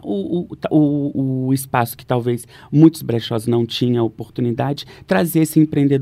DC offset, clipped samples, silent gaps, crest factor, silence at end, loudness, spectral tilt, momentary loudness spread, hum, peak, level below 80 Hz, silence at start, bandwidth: under 0.1%; under 0.1%; none; 18 dB; 0 s; -18 LUFS; -6.5 dB/octave; 10 LU; none; 0 dBFS; -54 dBFS; 0.05 s; 15.5 kHz